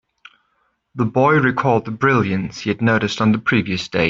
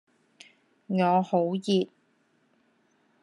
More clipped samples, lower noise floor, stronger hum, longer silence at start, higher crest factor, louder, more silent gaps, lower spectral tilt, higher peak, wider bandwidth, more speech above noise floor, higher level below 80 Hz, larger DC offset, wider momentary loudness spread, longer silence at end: neither; about the same, -66 dBFS vs -68 dBFS; neither; about the same, 0.95 s vs 0.9 s; about the same, 16 dB vs 16 dB; first, -18 LUFS vs -26 LUFS; neither; about the same, -6.5 dB/octave vs -7 dB/octave; first, -2 dBFS vs -12 dBFS; second, 7.8 kHz vs 10.5 kHz; first, 49 dB vs 44 dB; first, -52 dBFS vs -80 dBFS; neither; about the same, 8 LU vs 7 LU; second, 0 s vs 1.35 s